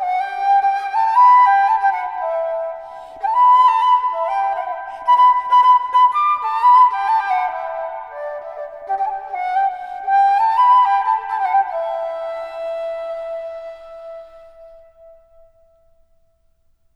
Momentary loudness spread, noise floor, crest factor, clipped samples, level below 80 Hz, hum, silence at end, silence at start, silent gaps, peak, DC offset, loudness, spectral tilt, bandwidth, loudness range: 17 LU; -59 dBFS; 14 dB; under 0.1%; -60 dBFS; none; 2.25 s; 0 s; none; -4 dBFS; under 0.1%; -16 LUFS; -1 dB/octave; 6.2 kHz; 14 LU